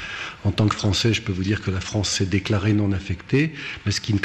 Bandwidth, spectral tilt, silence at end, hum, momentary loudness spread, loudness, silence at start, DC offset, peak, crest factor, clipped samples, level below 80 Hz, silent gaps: 9.8 kHz; -5 dB/octave; 0 s; none; 6 LU; -23 LUFS; 0 s; under 0.1%; -8 dBFS; 14 dB; under 0.1%; -46 dBFS; none